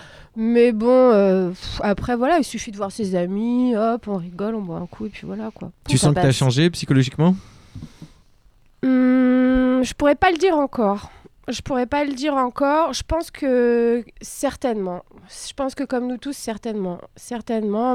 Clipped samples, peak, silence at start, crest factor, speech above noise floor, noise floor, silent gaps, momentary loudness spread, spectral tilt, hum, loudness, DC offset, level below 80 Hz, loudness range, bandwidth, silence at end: under 0.1%; -6 dBFS; 0 s; 16 dB; 34 dB; -53 dBFS; none; 15 LU; -6 dB/octave; none; -20 LUFS; under 0.1%; -44 dBFS; 5 LU; 14.5 kHz; 0 s